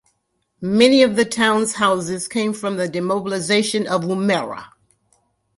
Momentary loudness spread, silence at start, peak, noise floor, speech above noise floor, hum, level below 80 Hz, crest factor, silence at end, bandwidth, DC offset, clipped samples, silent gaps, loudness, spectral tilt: 9 LU; 0.6 s; 0 dBFS; -70 dBFS; 51 dB; none; -60 dBFS; 18 dB; 0.9 s; 11.5 kHz; under 0.1%; under 0.1%; none; -18 LUFS; -4 dB/octave